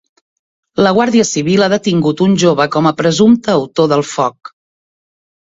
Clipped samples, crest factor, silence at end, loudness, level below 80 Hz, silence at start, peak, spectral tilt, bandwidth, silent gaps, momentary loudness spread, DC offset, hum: under 0.1%; 14 dB; 1 s; -12 LUFS; -52 dBFS; 0.8 s; 0 dBFS; -5 dB/octave; 7.8 kHz; none; 5 LU; under 0.1%; none